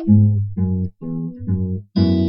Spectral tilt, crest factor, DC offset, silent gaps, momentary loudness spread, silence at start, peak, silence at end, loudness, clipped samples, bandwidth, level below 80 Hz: -11.5 dB/octave; 16 dB; under 0.1%; none; 12 LU; 0 s; -2 dBFS; 0 s; -20 LUFS; under 0.1%; 5.6 kHz; -44 dBFS